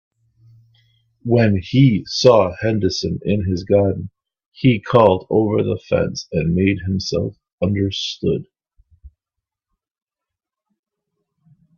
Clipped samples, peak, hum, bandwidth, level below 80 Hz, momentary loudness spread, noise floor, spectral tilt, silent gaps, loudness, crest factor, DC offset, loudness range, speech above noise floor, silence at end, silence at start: under 0.1%; 0 dBFS; none; 7.2 kHz; -48 dBFS; 9 LU; -85 dBFS; -6.5 dB/octave; 4.46-4.52 s, 7.53-7.58 s; -18 LUFS; 20 dB; under 0.1%; 9 LU; 68 dB; 2.7 s; 1.25 s